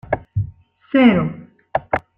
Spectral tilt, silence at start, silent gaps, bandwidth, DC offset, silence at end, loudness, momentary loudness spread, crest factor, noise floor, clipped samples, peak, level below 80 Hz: -9.5 dB/octave; 0.1 s; none; 4.1 kHz; under 0.1%; 0.2 s; -19 LUFS; 15 LU; 18 dB; -39 dBFS; under 0.1%; -2 dBFS; -44 dBFS